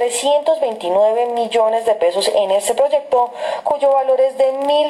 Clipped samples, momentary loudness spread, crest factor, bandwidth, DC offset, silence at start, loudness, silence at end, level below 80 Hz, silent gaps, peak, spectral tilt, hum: under 0.1%; 3 LU; 10 dB; 13.5 kHz; under 0.1%; 0 s; -16 LUFS; 0 s; -64 dBFS; none; -6 dBFS; -2 dB/octave; none